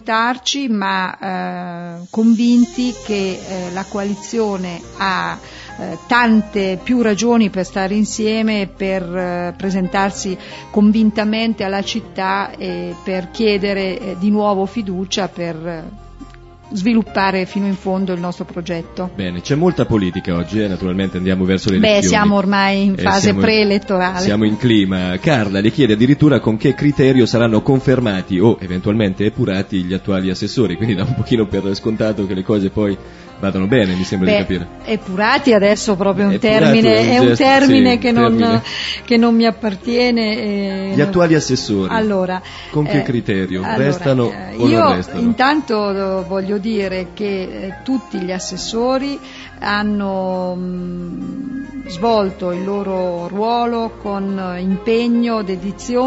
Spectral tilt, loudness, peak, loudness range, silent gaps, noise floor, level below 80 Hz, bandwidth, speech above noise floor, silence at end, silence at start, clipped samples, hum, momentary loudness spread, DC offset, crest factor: -6 dB/octave; -16 LUFS; 0 dBFS; 7 LU; none; -37 dBFS; -42 dBFS; 8 kHz; 21 dB; 0 s; 0.05 s; under 0.1%; none; 11 LU; under 0.1%; 16 dB